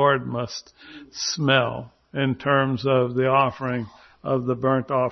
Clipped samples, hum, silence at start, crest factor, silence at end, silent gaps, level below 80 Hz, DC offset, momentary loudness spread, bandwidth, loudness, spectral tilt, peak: under 0.1%; none; 0 s; 18 dB; 0 s; none; -58 dBFS; under 0.1%; 15 LU; 6.4 kHz; -23 LUFS; -5 dB/octave; -4 dBFS